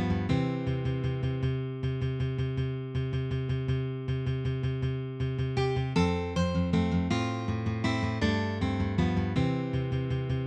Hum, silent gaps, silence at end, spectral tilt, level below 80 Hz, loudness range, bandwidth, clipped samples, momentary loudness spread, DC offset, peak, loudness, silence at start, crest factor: none; none; 0 s; -7.5 dB/octave; -44 dBFS; 3 LU; 8.4 kHz; under 0.1%; 5 LU; under 0.1%; -14 dBFS; -30 LUFS; 0 s; 16 dB